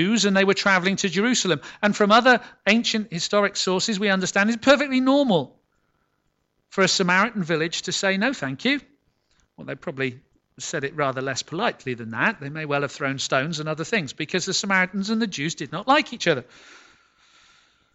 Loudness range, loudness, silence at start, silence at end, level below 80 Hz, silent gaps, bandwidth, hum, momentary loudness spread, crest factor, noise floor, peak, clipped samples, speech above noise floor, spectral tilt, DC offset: 7 LU; -22 LUFS; 0 s; 1.5 s; -64 dBFS; none; 8.4 kHz; none; 10 LU; 18 dB; -71 dBFS; -4 dBFS; under 0.1%; 49 dB; -3.5 dB/octave; under 0.1%